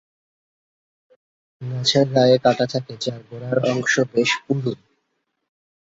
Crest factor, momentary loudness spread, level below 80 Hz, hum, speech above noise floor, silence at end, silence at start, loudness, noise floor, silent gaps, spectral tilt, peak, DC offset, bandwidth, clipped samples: 20 dB; 14 LU; -62 dBFS; none; 54 dB; 1.2 s; 1.6 s; -20 LUFS; -74 dBFS; none; -5 dB/octave; -2 dBFS; under 0.1%; 8 kHz; under 0.1%